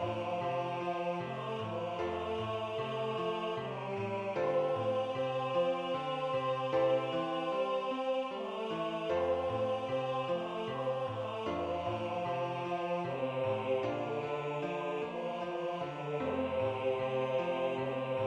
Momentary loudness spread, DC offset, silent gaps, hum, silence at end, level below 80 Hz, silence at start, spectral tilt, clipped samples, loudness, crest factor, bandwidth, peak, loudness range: 5 LU; under 0.1%; none; none; 0 s; -68 dBFS; 0 s; -6.5 dB/octave; under 0.1%; -35 LUFS; 16 dB; 8.8 kHz; -20 dBFS; 3 LU